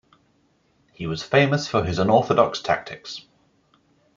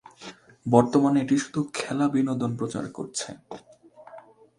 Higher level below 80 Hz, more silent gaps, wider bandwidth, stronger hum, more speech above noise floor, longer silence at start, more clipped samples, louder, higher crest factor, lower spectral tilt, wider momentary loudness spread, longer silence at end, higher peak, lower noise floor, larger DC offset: first, -54 dBFS vs -64 dBFS; neither; second, 7.6 kHz vs 11.5 kHz; neither; first, 43 dB vs 25 dB; first, 1 s vs 0.2 s; neither; first, -21 LUFS vs -25 LUFS; about the same, 22 dB vs 24 dB; about the same, -5.5 dB/octave vs -6 dB/octave; second, 17 LU vs 23 LU; first, 0.95 s vs 0.4 s; about the same, -2 dBFS vs -2 dBFS; first, -64 dBFS vs -49 dBFS; neither